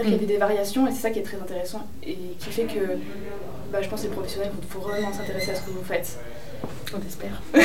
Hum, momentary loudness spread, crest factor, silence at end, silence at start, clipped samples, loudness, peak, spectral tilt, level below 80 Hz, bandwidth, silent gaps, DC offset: none; 14 LU; 24 dB; 0 s; 0 s; under 0.1%; -28 LUFS; -4 dBFS; -5 dB/octave; -48 dBFS; 16.5 kHz; none; 3%